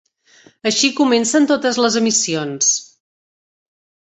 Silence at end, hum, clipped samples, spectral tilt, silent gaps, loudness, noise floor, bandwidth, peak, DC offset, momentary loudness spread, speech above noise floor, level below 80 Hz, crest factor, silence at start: 1.3 s; none; under 0.1%; -2 dB/octave; none; -16 LUFS; -51 dBFS; 8.4 kHz; -2 dBFS; under 0.1%; 6 LU; 35 dB; -64 dBFS; 16 dB; 0.65 s